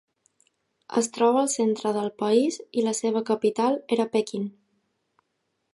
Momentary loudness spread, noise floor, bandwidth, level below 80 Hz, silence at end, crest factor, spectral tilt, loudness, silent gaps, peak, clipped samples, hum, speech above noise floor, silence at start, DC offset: 6 LU; -77 dBFS; 11.5 kHz; -78 dBFS; 1.25 s; 18 dB; -4.5 dB/octave; -25 LUFS; none; -8 dBFS; under 0.1%; none; 53 dB; 0.9 s; under 0.1%